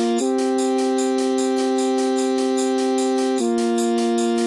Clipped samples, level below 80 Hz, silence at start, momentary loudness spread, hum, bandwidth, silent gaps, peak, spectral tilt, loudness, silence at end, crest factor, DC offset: under 0.1%; -72 dBFS; 0 s; 0 LU; none; 12 kHz; none; -10 dBFS; -3.5 dB/octave; -20 LUFS; 0 s; 10 dB; under 0.1%